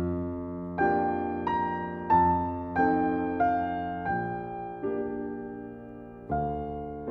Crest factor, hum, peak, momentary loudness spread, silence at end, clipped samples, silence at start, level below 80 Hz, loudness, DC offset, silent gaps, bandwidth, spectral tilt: 16 dB; none; -12 dBFS; 12 LU; 0 s; under 0.1%; 0 s; -50 dBFS; -29 LUFS; under 0.1%; none; 6 kHz; -9.5 dB/octave